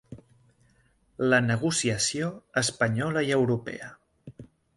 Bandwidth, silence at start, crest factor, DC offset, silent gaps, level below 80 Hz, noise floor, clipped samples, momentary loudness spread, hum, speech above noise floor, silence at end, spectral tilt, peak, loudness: 11.5 kHz; 0.1 s; 20 dB; under 0.1%; none; -60 dBFS; -65 dBFS; under 0.1%; 10 LU; none; 39 dB; 0.35 s; -4 dB/octave; -10 dBFS; -26 LUFS